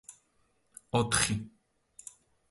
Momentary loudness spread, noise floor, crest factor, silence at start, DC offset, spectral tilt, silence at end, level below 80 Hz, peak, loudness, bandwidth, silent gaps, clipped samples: 23 LU; -72 dBFS; 24 dB; 0.1 s; under 0.1%; -3.5 dB/octave; 1 s; -56 dBFS; -12 dBFS; -30 LUFS; 12 kHz; none; under 0.1%